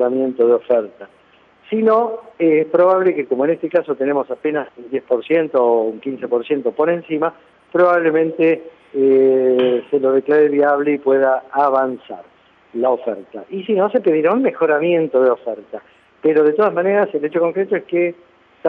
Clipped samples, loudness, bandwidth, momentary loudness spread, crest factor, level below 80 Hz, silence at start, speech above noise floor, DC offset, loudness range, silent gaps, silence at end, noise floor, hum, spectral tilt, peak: under 0.1%; -17 LUFS; 4.4 kHz; 11 LU; 14 dB; -74 dBFS; 0 s; 34 dB; under 0.1%; 4 LU; none; 0 s; -50 dBFS; none; -9 dB/octave; -2 dBFS